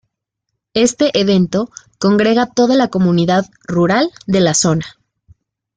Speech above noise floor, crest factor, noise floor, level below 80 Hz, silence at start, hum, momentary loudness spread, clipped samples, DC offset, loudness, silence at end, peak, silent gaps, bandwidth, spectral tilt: 62 dB; 14 dB; -76 dBFS; -50 dBFS; 0.75 s; none; 8 LU; under 0.1%; under 0.1%; -14 LUFS; 0.9 s; -2 dBFS; none; 9.4 kHz; -5 dB/octave